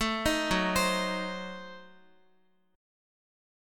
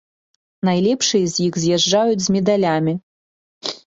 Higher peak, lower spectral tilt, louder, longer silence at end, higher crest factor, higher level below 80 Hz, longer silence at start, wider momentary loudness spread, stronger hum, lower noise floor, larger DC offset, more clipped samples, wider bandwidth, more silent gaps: second, -14 dBFS vs -4 dBFS; about the same, -3.5 dB/octave vs -4.5 dB/octave; second, -29 LUFS vs -18 LUFS; first, 1 s vs 0.1 s; about the same, 20 dB vs 16 dB; first, -50 dBFS vs -58 dBFS; second, 0 s vs 0.65 s; first, 16 LU vs 9 LU; neither; second, -70 dBFS vs under -90 dBFS; neither; neither; first, 17.5 kHz vs 8 kHz; second, none vs 3.03-3.61 s